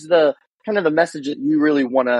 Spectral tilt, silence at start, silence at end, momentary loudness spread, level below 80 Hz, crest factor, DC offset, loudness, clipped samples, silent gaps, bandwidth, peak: -5.5 dB/octave; 0 s; 0 s; 7 LU; -70 dBFS; 14 dB; under 0.1%; -18 LUFS; under 0.1%; 0.47-0.58 s; 10.5 kHz; -4 dBFS